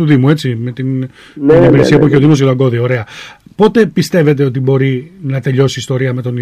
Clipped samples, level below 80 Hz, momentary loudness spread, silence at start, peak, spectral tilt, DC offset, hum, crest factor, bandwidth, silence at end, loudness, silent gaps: under 0.1%; -42 dBFS; 12 LU; 0 s; 0 dBFS; -7.5 dB/octave; under 0.1%; none; 10 dB; 13.5 kHz; 0 s; -11 LUFS; none